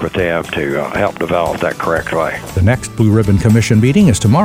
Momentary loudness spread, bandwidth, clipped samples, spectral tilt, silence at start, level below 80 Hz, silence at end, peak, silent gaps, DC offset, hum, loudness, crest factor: 7 LU; 16 kHz; under 0.1%; -6.5 dB/octave; 0 s; -34 dBFS; 0 s; 0 dBFS; none; under 0.1%; none; -14 LUFS; 12 dB